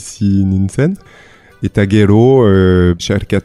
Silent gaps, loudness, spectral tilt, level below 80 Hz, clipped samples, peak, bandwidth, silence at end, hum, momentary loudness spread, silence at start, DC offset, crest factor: none; -11 LUFS; -7 dB/octave; -36 dBFS; under 0.1%; 0 dBFS; 11.5 kHz; 0.05 s; none; 9 LU; 0 s; under 0.1%; 12 dB